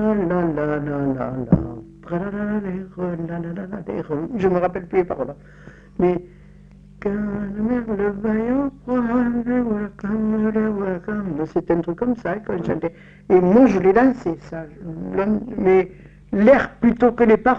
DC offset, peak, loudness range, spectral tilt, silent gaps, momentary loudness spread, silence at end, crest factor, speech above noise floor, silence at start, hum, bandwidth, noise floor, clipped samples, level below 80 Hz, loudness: under 0.1%; -2 dBFS; 7 LU; -9.5 dB/octave; none; 14 LU; 0 s; 18 dB; 25 dB; 0 s; none; 7 kHz; -45 dBFS; under 0.1%; -44 dBFS; -21 LUFS